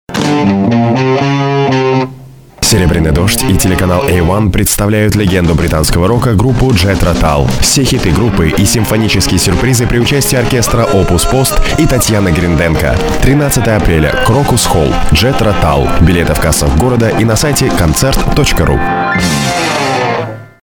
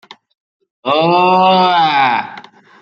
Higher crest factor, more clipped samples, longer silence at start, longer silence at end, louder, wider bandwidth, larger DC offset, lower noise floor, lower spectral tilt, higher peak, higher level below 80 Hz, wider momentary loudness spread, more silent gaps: about the same, 10 dB vs 12 dB; neither; second, 0.1 s vs 0.85 s; second, 0.25 s vs 0.4 s; about the same, -10 LUFS vs -12 LUFS; first, over 20 kHz vs 7 kHz; neither; second, -33 dBFS vs -37 dBFS; second, -5 dB/octave vs -6.5 dB/octave; about the same, 0 dBFS vs -2 dBFS; first, -18 dBFS vs -64 dBFS; second, 2 LU vs 11 LU; neither